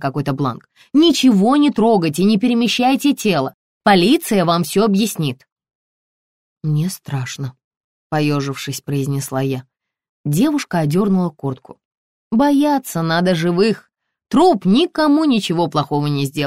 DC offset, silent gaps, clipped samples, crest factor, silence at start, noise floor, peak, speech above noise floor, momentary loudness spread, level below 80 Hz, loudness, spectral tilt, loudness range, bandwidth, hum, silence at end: 0.2%; 3.54-3.81 s, 5.52-5.56 s, 5.75-6.61 s, 7.64-7.71 s, 7.77-8.10 s, 10.09-10.24 s, 11.85-11.91 s, 11.97-12.31 s; under 0.1%; 14 dB; 0 s; under -90 dBFS; -2 dBFS; over 74 dB; 12 LU; -54 dBFS; -17 LUFS; -5.5 dB/octave; 8 LU; 16 kHz; none; 0 s